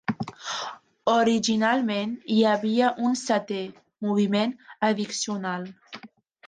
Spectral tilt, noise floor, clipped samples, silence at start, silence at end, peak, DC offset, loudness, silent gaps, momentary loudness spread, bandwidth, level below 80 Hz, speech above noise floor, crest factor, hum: -4.5 dB/octave; -49 dBFS; under 0.1%; 0.1 s; 0 s; -8 dBFS; under 0.1%; -25 LUFS; none; 13 LU; 9.6 kHz; -68 dBFS; 25 dB; 16 dB; none